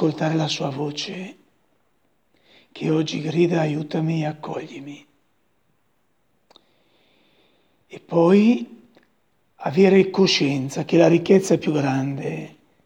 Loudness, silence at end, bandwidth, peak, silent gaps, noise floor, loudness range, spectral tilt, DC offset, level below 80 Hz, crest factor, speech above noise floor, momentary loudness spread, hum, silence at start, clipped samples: -20 LUFS; 0.4 s; 11.5 kHz; -2 dBFS; none; -69 dBFS; 12 LU; -6 dB/octave; under 0.1%; -68 dBFS; 20 dB; 49 dB; 17 LU; none; 0 s; under 0.1%